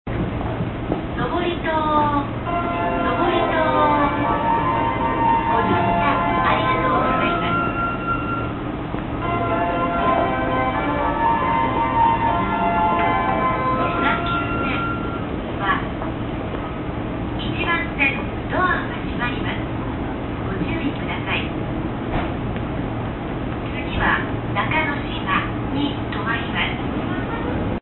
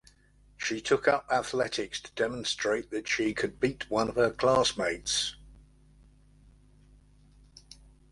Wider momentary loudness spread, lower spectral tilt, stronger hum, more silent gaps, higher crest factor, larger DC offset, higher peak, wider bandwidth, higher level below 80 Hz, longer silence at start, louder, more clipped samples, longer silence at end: about the same, 8 LU vs 8 LU; first, -11 dB/octave vs -3 dB/octave; neither; neither; second, 16 dB vs 22 dB; neither; first, -4 dBFS vs -10 dBFS; second, 4.3 kHz vs 11.5 kHz; first, -34 dBFS vs -56 dBFS; second, 0.05 s vs 0.6 s; first, -21 LUFS vs -29 LUFS; neither; second, 0 s vs 2.55 s